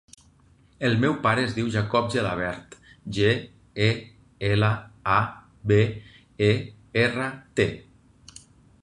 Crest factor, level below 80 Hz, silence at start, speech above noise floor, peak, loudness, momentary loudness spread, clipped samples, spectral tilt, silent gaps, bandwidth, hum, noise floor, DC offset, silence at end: 20 dB; -50 dBFS; 0.8 s; 34 dB; -6 dBFS; -25 LUFS; 11 LU; under 0.1%; -6.5 dB/octave; none; 10.5 kHz; none; -58 dBFS; under 0.1%; 1 s